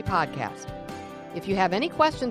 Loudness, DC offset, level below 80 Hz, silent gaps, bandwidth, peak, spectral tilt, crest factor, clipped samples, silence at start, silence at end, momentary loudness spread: -26 LUFS; under 0.1%; -50 dBFS; none; 15.5 kHz; -6 dBFS; -5.5 dB/octave; 22 dB; under 0.1%; 0 s; 0 s; 15 LU